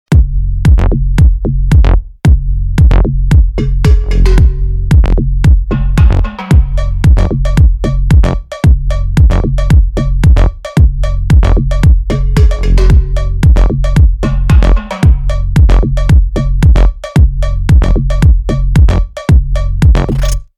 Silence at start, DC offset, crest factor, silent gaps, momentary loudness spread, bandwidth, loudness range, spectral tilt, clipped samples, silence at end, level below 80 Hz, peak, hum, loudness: 0.1 s; under 0.1%; 8 dB; none; 5 LU; 9.6 kHz; 1 LU; -7.5 dB/octave; 2%; 0.15 s; -8 dBFS; 0 dBFS; none; -11 LUFS